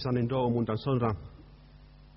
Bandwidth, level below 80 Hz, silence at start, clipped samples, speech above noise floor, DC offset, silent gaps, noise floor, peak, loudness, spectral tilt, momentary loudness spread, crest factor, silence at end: 5.8 kHz; -52 dBFS; 0 s; under 0.1%; 24 dB; under 0.1%; none; -53 dBFS; -16 dBFS; -30 LUFS; -7.5 dB/octave; 10 LU; 14 dB; 0.1 s